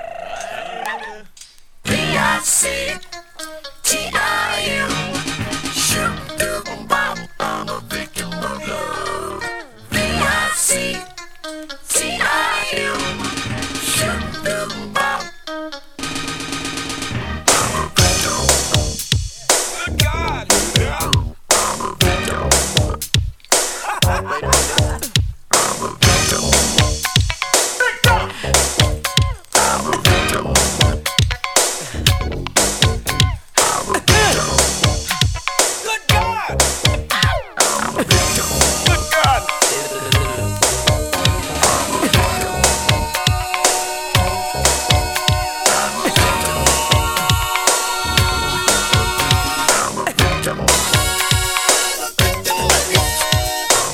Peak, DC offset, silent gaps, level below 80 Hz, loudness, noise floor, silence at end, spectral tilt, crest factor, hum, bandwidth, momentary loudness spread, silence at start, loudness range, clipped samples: 0 dBFS; under 0.1%; none; -28 dBFS; -16 LUFS; -41 dBFS; 0 s; -2.5 dB/octave; 18 dB; none; over 20 kHz; 10 LU; 0 s; 5 LU; under 0.1%